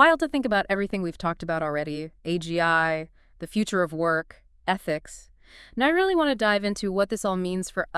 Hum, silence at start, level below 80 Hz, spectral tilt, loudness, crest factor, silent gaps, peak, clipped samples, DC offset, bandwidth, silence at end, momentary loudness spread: none; 0 s; -52 dBFS; -5 dB/octave; -25 LUFS; 22 dB; none; -4 dBFS; under 0.1%; under 0.1%; 12 kHz; 0 s; 12 LU